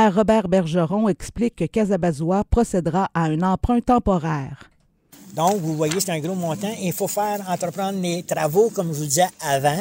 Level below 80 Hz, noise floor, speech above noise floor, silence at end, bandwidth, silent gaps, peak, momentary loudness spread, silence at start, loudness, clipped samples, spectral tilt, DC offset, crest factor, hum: -38 dBFS; -52 dBFS; 31 dB; 0 s; 16.5 kHz; none; -4 dBFS; 7 LU; 0 s; -21 LUFS; under 0.1%; -5.5 dB/octave; under 0.1%; 16 dB; none